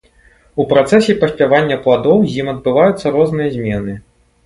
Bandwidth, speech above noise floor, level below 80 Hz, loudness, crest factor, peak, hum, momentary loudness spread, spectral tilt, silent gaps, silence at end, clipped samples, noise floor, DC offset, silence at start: 11.5 kHz; 36 dB; -44 dBFS; -14 LUFS; 14 dB; 0 dBFS; none; 10 LU; -6.5 dB/octave; none; 0.45 s; under 0.1%; -49 dBFS; under 0.1%; 0.55 s